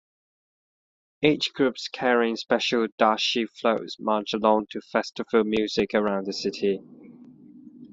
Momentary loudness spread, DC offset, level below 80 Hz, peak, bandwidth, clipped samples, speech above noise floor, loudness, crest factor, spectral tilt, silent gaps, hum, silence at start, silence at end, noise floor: 6 LU; under 0.1%; -64 dBFS; -4 dBFS; 7.8 kHz; under 0.1%; 24 dB; -25 LUFS; 22 dB; -4.5 dB/octave; 2.92-2.98 s; none; 1.2 s; 0.05 s; -48 dBFS